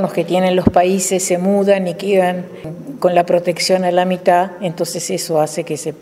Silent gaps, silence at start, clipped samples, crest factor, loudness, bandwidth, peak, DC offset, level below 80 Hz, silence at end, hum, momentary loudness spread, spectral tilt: none; 0 s; under 0.1%; 16 dB; -16 LUFS; 16 kHz; 0 dBFS; under 0.1%; -46 dBFS; 0.05 s; none; 8 LU; -4.5 dB/octave